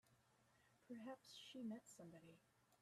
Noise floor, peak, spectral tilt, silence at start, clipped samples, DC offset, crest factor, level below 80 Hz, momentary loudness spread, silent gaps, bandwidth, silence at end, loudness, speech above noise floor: -79 dBFS; -44 dBFS; -4.5 dB/octave; 0.05 s; under 0.1%; under 0.1%; 16 dB; under -90 dBFS; 9 LU; none; 13.5 kHz; 0.05 s; -58 LUFS; 21 dB